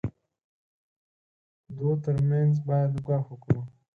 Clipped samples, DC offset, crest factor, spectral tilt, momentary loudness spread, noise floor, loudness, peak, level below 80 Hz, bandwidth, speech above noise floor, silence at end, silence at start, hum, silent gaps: under 0.1%; under 0.1%; 18 dB; -11 dB/octave; 8 LU; under -90 dBFS; -27 LUFS; -10 dBFS; -54 dBFS; 2.7 kHz; over 64 dB; 0.25 s; 0.05 s; none; 0.44-1.64 s